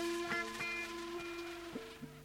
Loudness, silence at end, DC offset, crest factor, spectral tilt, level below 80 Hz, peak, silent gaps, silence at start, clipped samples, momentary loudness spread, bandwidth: -41 LUFS; 0 s; under 0.1%; 18 dB; -3 dB/octave; -66 dBFS; -26 dBFS; none; 0 s; under 0.1%; 10 LU; 19.5 kHz